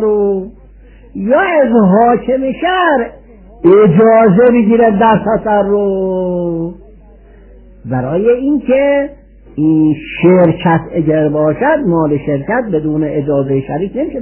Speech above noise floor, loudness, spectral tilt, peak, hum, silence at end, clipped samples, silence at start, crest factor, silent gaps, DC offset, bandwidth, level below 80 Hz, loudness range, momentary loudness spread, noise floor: 28 dB; -11 LUFS; -11.5 dB/octave; 0 dBFS; none; 0 s; under 0.1%; 0 s; 12 dB; none; under 0.1%; 3.2 kHz; -40 dBFS; 6 LU; 11 LU; -38 dBFS